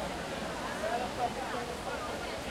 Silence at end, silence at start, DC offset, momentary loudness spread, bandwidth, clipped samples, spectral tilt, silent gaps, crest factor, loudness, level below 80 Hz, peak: 0 s; 0 s; under 0.1%; 3 LU; 16.5 kHz; under 0.1%; -4 dB/octave; none; 16 dB; -36 LUFS; -52 dBFS; -20 dBFS